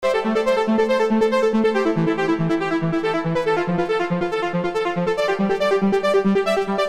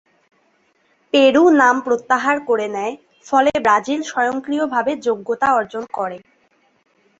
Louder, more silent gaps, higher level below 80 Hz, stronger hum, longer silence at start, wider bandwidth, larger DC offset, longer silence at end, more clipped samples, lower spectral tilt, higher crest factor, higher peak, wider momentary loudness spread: second, -20 LUFS vs -17 LUFS; neither; first, -50 dBFS vs -60 dBFS; neither; second, 0 s vs 1.15 s; first, 13 kHz vs 8 kHz; neither; second, 0 s vs 1 s; neither; first, -6.5 dB/octave vs -3.5 dB/octave; second, 10 dB vs 18 dB; second, -8 dBFS vs 0 dBFS; second, 4 LU vs 14 LU